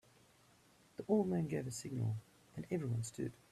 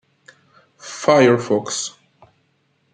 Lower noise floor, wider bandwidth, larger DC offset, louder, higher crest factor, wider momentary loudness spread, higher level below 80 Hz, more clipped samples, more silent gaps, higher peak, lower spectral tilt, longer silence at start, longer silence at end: first, -68 dBFS vs -64 dBFS; first, 14 kHz vs 9.6 kHz; neither; second, -40 LUFS vs -17 LUFS; about the same, 20 dB vs 18 dB; second, 16 LU vs 20 LU; second, -72 dBFS vs -64 dBFS; neither; neither; second, -20 dBFS vs -2 dBFS; first, -7 dB/octave vs -4.5 dB/octave; first, 1 s vs 0.85 s; second, 0.2 s vs 1.05 s